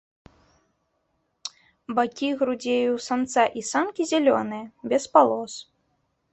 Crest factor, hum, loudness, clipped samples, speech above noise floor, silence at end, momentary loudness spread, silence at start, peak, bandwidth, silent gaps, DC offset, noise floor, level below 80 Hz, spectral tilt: 22 dB; none; -23 LUFS; under 0.1%; 50 dB; 0.7 s; 18 LU; 1.45 s; -2 dBFS; 8.4 kHz; none; under 0.1%; -73 dBFS; -68 dBFS; -3.5 dB/octave